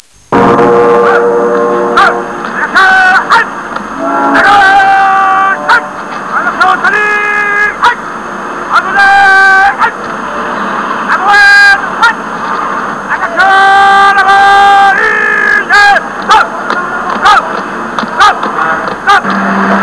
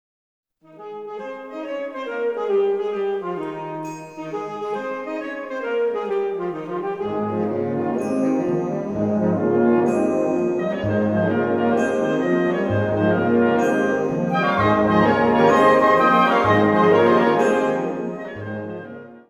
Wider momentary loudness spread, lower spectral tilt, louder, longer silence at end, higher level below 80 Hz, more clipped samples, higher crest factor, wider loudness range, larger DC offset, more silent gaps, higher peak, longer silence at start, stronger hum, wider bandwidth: second, 12 LU vs 15 LU; second, -3.5 dB/octave vs -7 dB/octave; first, -6 LUFS vs -20 LUFS; about the same, 0 s vs 0.1 s; first, -42 dBFS vs -54 dBFS; first, 4% vs under 0.1%; second, 8 dB vs 16 dB; second, 4 LU vs 10 LU; first, 0.5% vs under 0.1%; neither; first, 0 dBFS vs -4 dBFS; second, 0.3 s vs 0.75 s; neither; about the same, 11 kHz vs 11.5 kHz